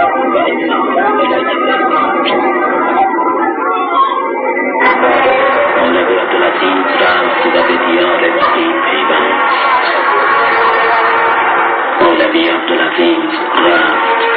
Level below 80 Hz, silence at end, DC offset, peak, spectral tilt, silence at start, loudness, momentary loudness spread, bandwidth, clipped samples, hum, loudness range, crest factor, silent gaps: -54 dBFS; 0 s; under 0.1%; 0 dBFS; -8.5 dB/octave; 0 s; -11 LUFS; 3 LU; 5.2 kHz; under 0.1%; none; 2 LU; 10 dB; none